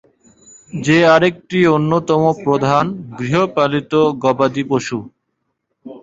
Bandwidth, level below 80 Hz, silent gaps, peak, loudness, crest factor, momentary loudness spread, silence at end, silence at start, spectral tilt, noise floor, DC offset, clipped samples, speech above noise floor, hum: 7.8 kHz; -54 dBFS; none; -2 dBFS; -15 LUFS; 14 dB; 11 LU; 0.05 s; 0.75 s; -6 dB/octave; -72 dBFS; under 0.1%; under 0.1%; 57 dB; none